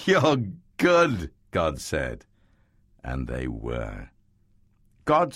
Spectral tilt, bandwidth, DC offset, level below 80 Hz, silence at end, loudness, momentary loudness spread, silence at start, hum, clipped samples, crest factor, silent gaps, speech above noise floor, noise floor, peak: -5.5 dB/octave; 15.5 kHz; under 0.1%; -42 dBFS; 0 s; -26 LUFS; 15 LU; 0 s; none; under 0.1%; 20 dB; none; 37 dB; -62 dBFS; -6 dBFS